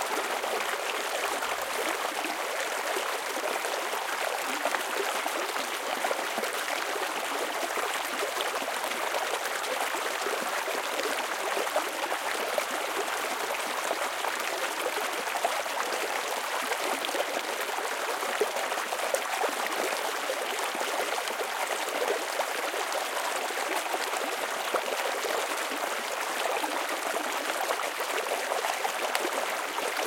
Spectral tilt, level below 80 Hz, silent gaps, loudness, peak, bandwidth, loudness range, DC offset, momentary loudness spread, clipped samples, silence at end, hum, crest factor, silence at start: 0.5 dB/octave; -80 dBFS; none; -30 LUFS; -4 dBFS; 17 kHz; 0 LU; under 0.1%; 2 LU; under 0.1%; 0 s; none; 28 dB; 0 s